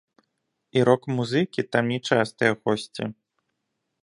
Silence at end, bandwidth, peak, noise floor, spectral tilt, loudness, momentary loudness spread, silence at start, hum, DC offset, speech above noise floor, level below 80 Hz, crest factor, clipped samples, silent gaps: 0.9 s; 11.5 kHz; -4 dBFS; -79 dBFS; -6 dB/octave; -24 LUFS; 9 LU; 0.75 s; none; under 0.1%; 56 dB; -66 dBFS; 22 dB; under 0.1%; none